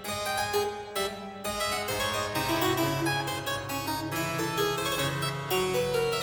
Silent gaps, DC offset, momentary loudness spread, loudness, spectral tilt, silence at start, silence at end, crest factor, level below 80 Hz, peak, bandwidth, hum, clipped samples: none; under 0.1%; 5 LU; -29 LUFS; -3.5 dB/octave; 0 s; 0 s; 14 dB; -54 dBFS; -14 dBFS; 17.5 kHz; none; under 0.1%